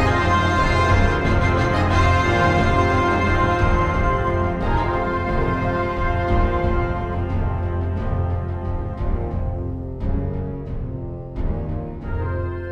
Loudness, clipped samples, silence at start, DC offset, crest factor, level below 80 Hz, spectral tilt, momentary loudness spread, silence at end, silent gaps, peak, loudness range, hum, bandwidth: -21 LUFS; under 0.1%; 0 s; under 0.1%; 16 dB; -26 dBFS; -7 dB/octave; 11 LU; 0 s; none; -4 dBFS; 9 LU; none; 8.8 kHz